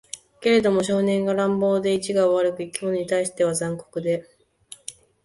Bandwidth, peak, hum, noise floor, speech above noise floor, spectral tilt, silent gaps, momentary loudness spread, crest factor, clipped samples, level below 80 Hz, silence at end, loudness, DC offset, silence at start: 12 kHz; -8 dBFS; none; -48 dBFS; 27 dB; -5 dB/octave; none; 14 LU; 16 dB; under 0.1%; -62 dBFS; 0.35 s; -22 LUFS; under 0.1%; 0.15 s